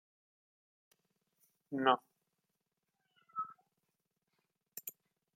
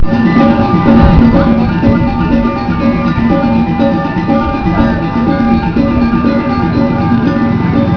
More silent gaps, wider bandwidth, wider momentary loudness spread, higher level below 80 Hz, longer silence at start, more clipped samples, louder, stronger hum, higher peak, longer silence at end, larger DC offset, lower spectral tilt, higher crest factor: neither; first, 16.5 kHz vs 5.4 kHz; first, 16 LU vs 5 LU; second, under -90 dBFS vs -22 dBFS; first, 1.7 s vs 0 s; second, under 0.1% vs 0.4%; second, -38 LUFS vs -10 LUFS; neither; second, -14 dBFS vs 0 dBFS; first, 0.45 s vs 0 s; neither; second, -3.5 dB/octave vs -9.5 dB/octave; first, 30 dB vs 10 dB